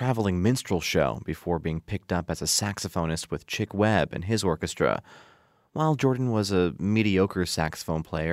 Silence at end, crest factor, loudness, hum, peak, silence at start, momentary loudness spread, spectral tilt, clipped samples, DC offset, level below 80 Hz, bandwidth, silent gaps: 0 s; 20 dB; -26 LUFS; none; -6 dBFS; 0 s; 7 LU; -5 dB/octave; under 0.1%; under 0.1%; -48 dBFS; 16 kHz; none